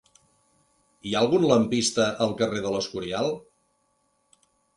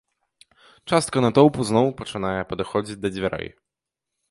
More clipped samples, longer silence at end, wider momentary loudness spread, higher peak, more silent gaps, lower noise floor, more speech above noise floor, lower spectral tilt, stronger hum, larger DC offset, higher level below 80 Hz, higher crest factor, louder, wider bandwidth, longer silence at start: neither; first, 1.35 s vs 0.8 s; second, 9 LU vs 12 LU; second, -6 dBFS vs -2 dBFS; neither; second, -70 dBFS vs -85 dBFS; second, 46 dB vs 63 dB; about the same, -4.5 dB/octave vs -5.5 dB/octave; neither; neither; second, -60 dBFS vs -52 dBFS; about the same, 20 dB vs 22 dB; about the same, -24 LUFS vs -22 LUFS; about the same, 11.5 kHz vs 11.5 kHz; first, 1.05 s vs 0.85 s